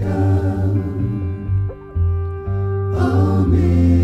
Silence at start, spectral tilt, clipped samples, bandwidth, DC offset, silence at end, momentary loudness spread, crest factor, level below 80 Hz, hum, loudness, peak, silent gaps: 0 s; -10 dB/octave; under 0.1%; 5.8 kHz; under 0.1%; 0 s; 8 LU; 12 dB; -28 dBFS; none; -19 LUFS; -4 dBFS; none